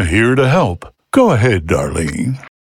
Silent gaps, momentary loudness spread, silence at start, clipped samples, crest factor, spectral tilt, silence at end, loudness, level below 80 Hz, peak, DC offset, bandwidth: none; 10 LU; 0 s; under 0.1%; 14 dB; -6.5 dB/octave; 0.25 s; -14 LUFS; -36 dBFS; 0 dBFS; under 0.1%; 15 kHz